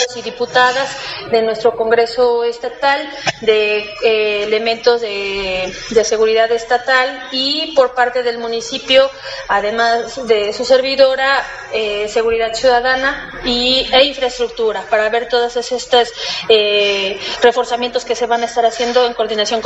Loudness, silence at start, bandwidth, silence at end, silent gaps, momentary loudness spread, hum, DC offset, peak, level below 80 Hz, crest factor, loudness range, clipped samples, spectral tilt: -15 LUFS; 0 s; 8.2 kHz; 0 s; none; 7 LU; none; under 0.1%; 0 dBFS; -46 dBFS; 14 dB; 1 LU; under 0.1%; -2 dB/octave